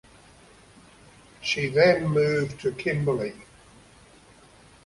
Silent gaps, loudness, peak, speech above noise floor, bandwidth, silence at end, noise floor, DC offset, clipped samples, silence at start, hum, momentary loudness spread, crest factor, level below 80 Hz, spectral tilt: none; -24 LUFS; -6 dBFS; 30 dB; 11.5 kHz; 1.4 s; -53 dBFS; under 0.1%; under 0.1%; 1.4 s; none; 10 LU; 20 dB; -58 dBFS; -6 dB/octave